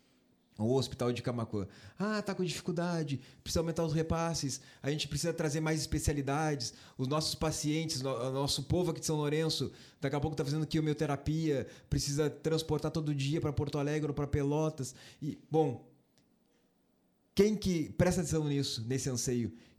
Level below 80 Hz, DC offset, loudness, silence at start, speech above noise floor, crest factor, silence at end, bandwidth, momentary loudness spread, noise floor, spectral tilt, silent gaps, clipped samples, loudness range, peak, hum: -52 dBFS; under 0.1%; -34 LUFS; 0.6 s; 39 dB; 20 dB; 0.2 s; 15.5 kHz; 7 LU; -72 dBFS; -5 dB/octave; none; under 0.1%; 2 LU; -14 dBFS; none